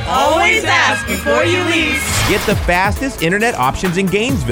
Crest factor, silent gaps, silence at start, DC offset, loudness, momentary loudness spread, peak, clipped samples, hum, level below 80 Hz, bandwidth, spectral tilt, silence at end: 14 dB; none; 0 s; under 0.1%; -14 LUFS; 5 LU; 0 dBFS; under 0.1%; none; -30 dBFS; over 20 kHz; -4 dB/octave; 0 s